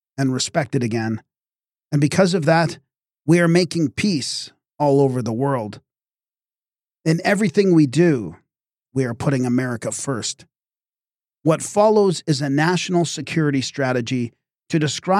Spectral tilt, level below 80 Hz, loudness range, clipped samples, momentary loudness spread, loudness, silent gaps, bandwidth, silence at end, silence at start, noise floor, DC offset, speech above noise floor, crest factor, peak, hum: -5.5 dB/octave; -60 dBFS; 4 LU; under 0.1%; 11 LU; -20 LUFS; none; 14 kHz; 0 s; 0.2 s; under -90 dBFS; under 0.1%; over 71 dB; 16 dB; -4 dBFS; none